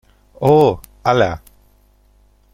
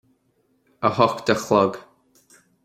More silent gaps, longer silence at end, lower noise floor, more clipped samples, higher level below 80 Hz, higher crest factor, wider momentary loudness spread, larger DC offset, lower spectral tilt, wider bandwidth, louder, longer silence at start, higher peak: neither; first, 1.15 s vs 0.85 s; second, -53 dBFS vs -66 dBFS; neither; first, -46 dBFS vs -62 dBFS; second, 16 dB vs 22 dB; first, 9 LU vs 6 LU; neither; first, -7 dB/octave vs -5.5 dB/octave; about the same, 16.5 kHz vs 16 kHz; first, -16 LUFS vs -21 LUFS; second, 0.4 s vs 0.8 s; about the same, -2 dBFS vs -2 dBFS